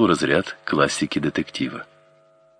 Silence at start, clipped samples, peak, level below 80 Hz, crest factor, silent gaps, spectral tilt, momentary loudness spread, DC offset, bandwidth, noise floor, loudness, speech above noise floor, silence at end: 0 s; under 0.1%; -4 dBFS; -54 dBFS; 20 dB; none; -4.5 dB/octave; 9 LU; under 0.1%; 10.5 kHz; -56 dBFS; -22 LUFS; 34 dB; 0.75 s